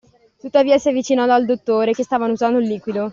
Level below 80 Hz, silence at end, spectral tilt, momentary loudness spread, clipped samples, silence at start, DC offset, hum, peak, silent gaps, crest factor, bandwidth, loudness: -60 dBFS; 0 s; -5 dB/octave; 6 LU; under 0.1%; 0.45 s; under 0.1%; none; -2 dBFS; none; 14 dB; 7.6 kHz; -17 LUFS